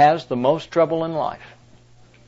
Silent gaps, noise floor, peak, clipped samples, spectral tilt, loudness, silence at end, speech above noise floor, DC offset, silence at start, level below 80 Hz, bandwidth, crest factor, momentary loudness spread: none; -50 dBFS; -4 dBFS; under 0.1%; -6.5 dB/octave; -21 LUFS; 0.8 s; 31 dB; under 0.1%; 0 s; -60 dBFS; 7.8 kHz; 16 dB; 9 LU